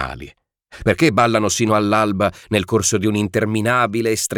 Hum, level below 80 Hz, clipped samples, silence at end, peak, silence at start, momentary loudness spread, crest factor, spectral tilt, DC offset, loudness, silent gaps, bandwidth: none; -44 dBFS; under 0.1%; 0 s; -4 dBFS; 0 s; 6 LU; 14 dB; -4.5 dB/octave; under 0.1%; -17 LUFS; none; 19 kHz